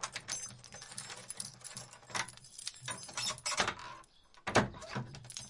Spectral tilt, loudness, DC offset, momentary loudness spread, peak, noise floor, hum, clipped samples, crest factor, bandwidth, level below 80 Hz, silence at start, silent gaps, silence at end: -2.5 dB/octave; -39 LUFS; under 0.1%; 14 LU; -14 dBFS; -59 dBFS; none; under 0.1%; 28 dB; 11.5 kHz; -64 dBFS; 0 s; none; 0 s